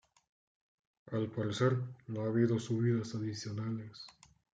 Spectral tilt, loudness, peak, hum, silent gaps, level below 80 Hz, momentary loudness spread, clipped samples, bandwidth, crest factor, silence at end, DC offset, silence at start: -7 dB/octave; -35 LUFS; -18 dBFS; none; none; -74 dBFS; 11 LU; under 0.1%; 9 kHz; 18 dB; 0.5 s; under 0.1%; 1.05 s